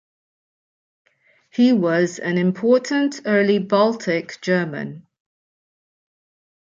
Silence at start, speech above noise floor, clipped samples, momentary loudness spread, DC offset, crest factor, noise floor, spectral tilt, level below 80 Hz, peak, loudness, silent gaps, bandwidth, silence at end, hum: 1.55 s; 34 dB; under 0.1%; 8 LU; under 0.1%; 18 dB; -53 dBFS; -6 dB/octave; -70 dBFS; -4 dBFS; -19 LUFS; none; 7.6 kHz; 1.65 s; none